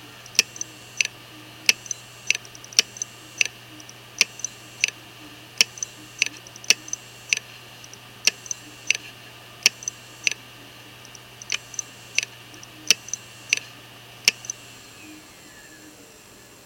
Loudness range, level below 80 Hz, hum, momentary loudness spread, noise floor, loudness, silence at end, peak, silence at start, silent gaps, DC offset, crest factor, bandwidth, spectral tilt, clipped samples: 4 LU; -66 dBFS; none; 21 LU; -48 dBFS; -24 LUFS; 1.5 s; 0 dBFS; 0.4 s; none; under 0.1%; 30 dB; 17 kHz; 1 dB/octave; under 0.1%